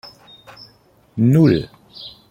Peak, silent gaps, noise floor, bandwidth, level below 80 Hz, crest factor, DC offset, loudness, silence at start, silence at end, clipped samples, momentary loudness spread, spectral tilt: -2 dBFS; none; -53 dBFS; 16 kHz; -50 dBFS; 18 dB; under 0.1%; -15 LUFS; 0.05 s; 0.2 s; under 0.1%; 23 LU; -8.5 dB/octave